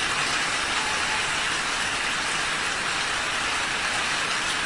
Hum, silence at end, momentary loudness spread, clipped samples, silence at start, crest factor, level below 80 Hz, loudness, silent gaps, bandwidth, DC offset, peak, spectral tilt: none; 0 s; 1 LU; under 0.1%; 0 s; 14 dB; -50 dBFS; -24 LUFS; none; 12 kHz; 0.2%; -12 dBFS; -0.5 dB/octave